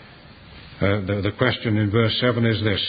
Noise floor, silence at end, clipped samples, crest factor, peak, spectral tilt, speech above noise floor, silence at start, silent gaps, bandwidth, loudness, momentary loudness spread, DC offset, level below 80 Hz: -45 dBFS; 0 s; under 0.1%; 18 dB; -2 dBFS; -11 dB/octave; 24 dB; 0 s; none; 5 kHz; -21 LUFS; 4 LU; under 0.1%; -42 dBFS